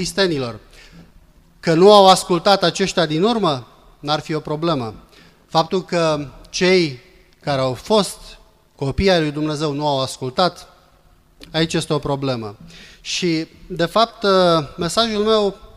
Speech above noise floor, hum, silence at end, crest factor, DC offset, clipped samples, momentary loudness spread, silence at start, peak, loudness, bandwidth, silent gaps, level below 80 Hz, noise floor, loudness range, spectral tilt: 35 dB; none; 0.1 s; 18 dB; under 0.1%; under 0.1%; 13 LU; 0 s; 0 dBFS; -18 LUFS; 15.5 kHz; none; -44 dBFS; -53 dBFS; 7 LU; -4.5 dB/octave